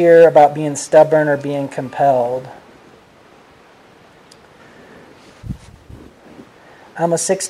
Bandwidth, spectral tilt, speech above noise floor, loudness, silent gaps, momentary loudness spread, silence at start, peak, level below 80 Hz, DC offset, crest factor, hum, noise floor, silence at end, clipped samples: 13 kHz; -5 dB/octave; 33 dB; -14 LUFS; none; 24 LU; 0 s; 0 dBFS; -50 dBFS; under 0.1%; 16 dB; none; -46 dBFS; 0 s; under 0.1%